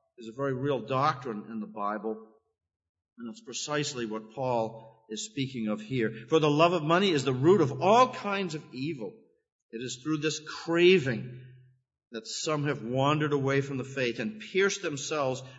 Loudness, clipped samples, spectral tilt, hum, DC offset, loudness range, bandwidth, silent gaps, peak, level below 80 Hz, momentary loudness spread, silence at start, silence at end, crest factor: -28 LUFS; under 0.1%; -5 dB/octave; none; under 0.1%; 9 LU; 8 kHz; 2.89-2.94 s, 9.52-9.69 s, 12.07-12.11 s; -8 dBFS; -72 dBFS; 16 LU; 0.2 s; 0 s; 20 dB